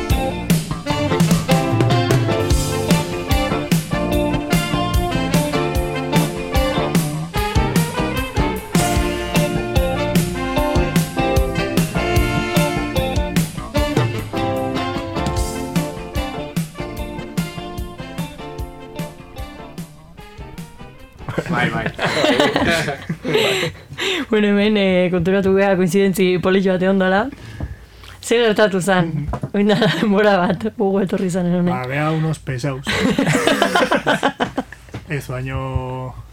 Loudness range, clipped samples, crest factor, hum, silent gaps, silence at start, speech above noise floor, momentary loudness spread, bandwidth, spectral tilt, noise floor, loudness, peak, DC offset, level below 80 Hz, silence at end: 9 LU; under 0.1%; 18 dB; none; none; 0 s; 22 dB; 14 LU; 17 kHz; -5.5 dB/octave; -39 dBFS; -18 LUFS; 0 dBFS; under 0.1%; -30 dBFS; 0 s